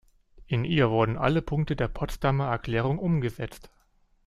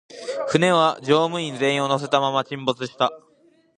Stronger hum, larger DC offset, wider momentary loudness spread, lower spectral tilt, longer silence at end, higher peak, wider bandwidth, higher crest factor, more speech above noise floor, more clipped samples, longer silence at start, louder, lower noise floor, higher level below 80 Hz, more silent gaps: neither; neither; about the same, 8 LU vs 8 LU; first, -7.5 dB/octave vs -5 dB/octave; about the same, 0.6 s vs 0.6 s; second, -8 dBFS vs -2 dBFS; first, 14 kHz vs 11 kHz; about the same, 18 dB vs 20 dB; about the same, 38 dB vs 37 dB; neither; first, 0.35 s vs 0.1 s; second, -27 LUFS vs -21 LUFS; first, -64 dBFS vs -58 dBFS; first, -42 dBFS vs -64 dBFS; neither